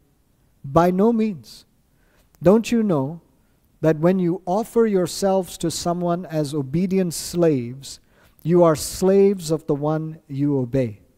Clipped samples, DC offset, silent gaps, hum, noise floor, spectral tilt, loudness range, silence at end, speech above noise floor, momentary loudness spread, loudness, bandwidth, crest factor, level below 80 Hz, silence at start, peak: under 0.1%; under 0.1%; none; none; -61 dBFS; -6.5 dB/octave; 2 LU; 0.2 s; 41 dB; 13 LU; -20 LUFS; 16 kHz; 20 dB; -50 dBFS; 0.65 s; -2 dBFS